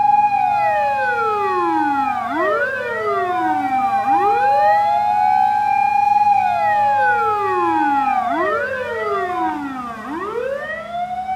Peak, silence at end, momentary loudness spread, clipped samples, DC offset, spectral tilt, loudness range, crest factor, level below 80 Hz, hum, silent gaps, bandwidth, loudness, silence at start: -6 dBFS; 0 s; 9 LU; under 0.1%; under 0.1%; -5 dB/octave; 5 LU; 12 dB; -54 dBFS; none; none; 13.5 kHz; -18 LUFS; 0 s